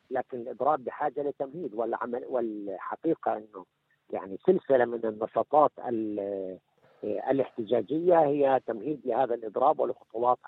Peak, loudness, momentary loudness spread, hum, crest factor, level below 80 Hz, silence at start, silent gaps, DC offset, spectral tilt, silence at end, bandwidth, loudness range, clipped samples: -8 dBFS; -29 LUFS; 13 LU; none; 20 dB; -78 dBFS; 0.1 s; none; under 0.1%; -10 dB/octave; 0 s; 4.1 kHz; 5 LU; under 0.1%